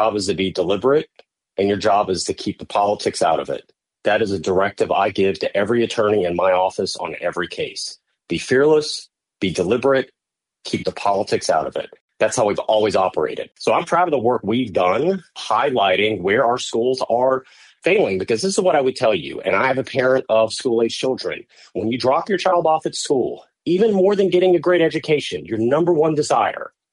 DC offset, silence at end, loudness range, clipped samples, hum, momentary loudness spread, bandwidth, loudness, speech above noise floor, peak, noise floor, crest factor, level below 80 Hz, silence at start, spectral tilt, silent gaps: under 0.1%; 0.25 s; 3 LU; under 0.1%; none; 9 LU; 11.5 kHz; -19 LUFS; 47 dB; -6 dBFS; -65 dBFS; 14 dB; -58 dBFS; 0 s; -4.5 dB/octave; 12.01-12.08 s